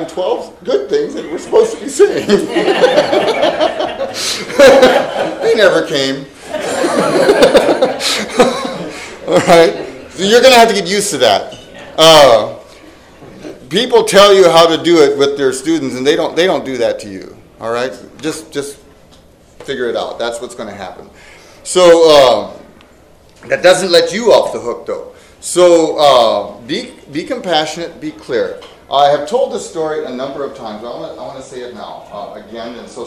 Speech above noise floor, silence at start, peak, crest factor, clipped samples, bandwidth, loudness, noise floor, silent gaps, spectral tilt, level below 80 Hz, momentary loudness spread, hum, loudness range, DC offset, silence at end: 32 dB; 0 s; 0 dBFS; 12 dB; 2%; over 20 kHz; -11 LUFS; -43 dBFS; none; -3.5 dB/octave; -46 dBFS; 21 LU; none; 12 LU; under 0.1%; 0 s